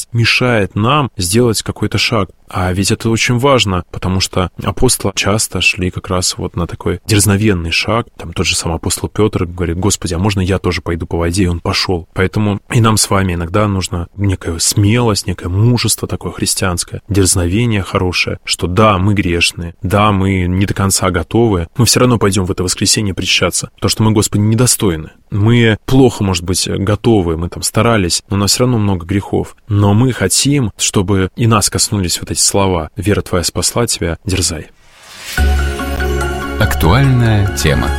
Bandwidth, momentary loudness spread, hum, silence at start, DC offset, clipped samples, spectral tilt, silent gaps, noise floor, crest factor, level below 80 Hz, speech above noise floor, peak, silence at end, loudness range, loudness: 16.5 kHz; 7 LU; none; 0 s; 0.2%; under 0.1%; -4.5 dB/octave; none; -35 dBFS; 14 dB; -28 dBFS; 22 dB; 0 dBFS; 0 s; 3 LU; -13 LUFS